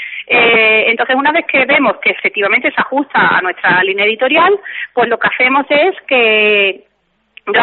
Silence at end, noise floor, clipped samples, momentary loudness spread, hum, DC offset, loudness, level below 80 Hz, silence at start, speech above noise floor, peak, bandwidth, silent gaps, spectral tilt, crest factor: 0 s; -45 dBFS; under 0.1%; 7 LU; none; under 0.1%; -11 LUFS; -60 dBFS; 0 s; 33 dB; -2 dBFS; 4.4 kHz; none; -0.5 dB/octave; 12 dB